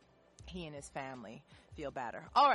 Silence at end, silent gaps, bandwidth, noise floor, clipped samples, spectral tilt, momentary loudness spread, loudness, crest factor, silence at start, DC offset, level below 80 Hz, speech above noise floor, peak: 0 s; none; 11.5 kHz; -58 dBFS; under 0.1%; -4 dB/octave; 21 LU; -39 LUFS; 20 dB; 0.4 s; under 0.1%; -62 dBFS; 22 dB; -16 dBFS